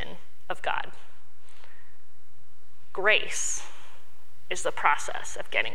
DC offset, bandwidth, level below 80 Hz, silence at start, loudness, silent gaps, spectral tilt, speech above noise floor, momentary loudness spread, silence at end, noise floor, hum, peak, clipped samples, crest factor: 6%; 17 kHz; -62 dBFS; 0 s; -28 LUFS; none; -1 dB/octave; 34 dB; 18 LU; 0 s; -62 dBFS; none; -4 dBFS; under 0.1%; 26 dB